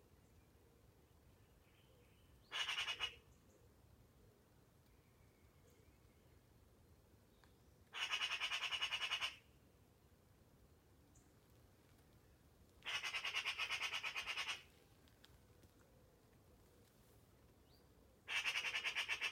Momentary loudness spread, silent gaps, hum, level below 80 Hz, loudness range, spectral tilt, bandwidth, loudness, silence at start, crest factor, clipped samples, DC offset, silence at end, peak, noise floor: 9 LU; none; none; -76 dBFS; 8 LU; 0 dB/octave; 16.5 kHz; -42 LUFS; 0.35 s; 22 dB; under 0.1%; under 0.1%; 0 s; -28 dBFS; -71 dBFS